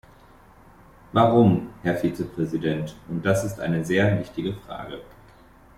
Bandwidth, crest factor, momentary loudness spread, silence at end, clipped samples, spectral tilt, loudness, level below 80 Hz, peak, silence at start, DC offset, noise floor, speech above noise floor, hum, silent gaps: 15.5 kHz; 20 dB; 16 LU; 0.75 s; under 0.1%; -7 dB/octave; -23 LUFS; -52 dBFS; -6 dBFS; 1.15 s; under 0.1%; -51 dBFS; 28 dB; none; none